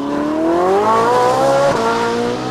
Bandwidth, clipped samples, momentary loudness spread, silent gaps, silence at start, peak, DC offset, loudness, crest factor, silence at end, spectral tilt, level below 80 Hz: 15 kHz; under 0.1%; 5 LU; none; 0 s; -4 dBFS; under 0.1%; -14 LUFS; 10 dB; 0 s; -5 dB/octave; -46 dBFS